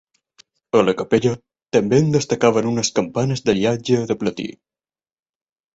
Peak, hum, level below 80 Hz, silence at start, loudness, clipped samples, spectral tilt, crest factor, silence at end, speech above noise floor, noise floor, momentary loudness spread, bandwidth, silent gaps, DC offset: -2 dBFS; none; -54 dBFS; 0.75 s; -19 LUFS; under 0.1%; -5.5 dB/octave; 18 dB; 1.25 s; over 72 dB; under -90 dBFS; 6 LU; 8 kHz; none; under 0.1%